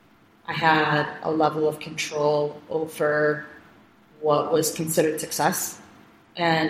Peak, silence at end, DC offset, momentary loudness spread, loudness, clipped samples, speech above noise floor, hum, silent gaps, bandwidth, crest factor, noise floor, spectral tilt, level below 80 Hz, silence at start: -4 dBFS; 0 s; under 0.1%; 11 LU; -24 LUFS; under 0.1%; 30 dB; none; none; 16 kHz; 20 dB; -54 dBFS; -4 dB/octave; -64 dBFS; 0.5 s